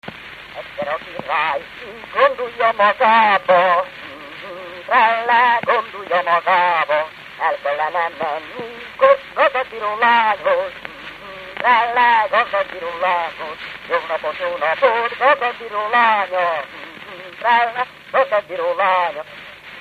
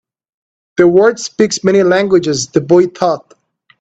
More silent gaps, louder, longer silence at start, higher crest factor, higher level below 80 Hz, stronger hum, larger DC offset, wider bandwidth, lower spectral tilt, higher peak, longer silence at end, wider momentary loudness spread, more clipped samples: neither; second, -17 LUFS vs -12 LUFS; second, 0.05 s vs 0.8 s; first, 18 dB vs 12 dB; second, -60 dBFS vs -54 dBFS; neither; neither; first, 10 kHz vs 8.4 kHz; about the same, -4 dB/octave vs -5 dB/octave; about the same, 0 dBFS vs 0 dBFS; second, 0 s vs 0.6 s; first, 18 LU vs 7 LU; neither